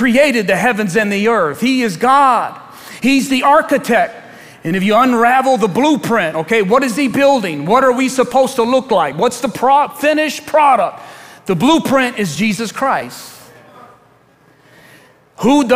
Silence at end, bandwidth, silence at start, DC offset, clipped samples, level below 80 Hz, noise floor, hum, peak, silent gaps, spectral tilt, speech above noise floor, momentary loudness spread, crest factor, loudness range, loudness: 0 s; 16 kHz; 0 s; under 0.1%; under 0.1%; -54 dBFS; -49 dBFS; none; 0 dBFS; none; -4.5 dB/octave; 37 dB; 9 LU; 14 dB; 4 LU; -13 LUFS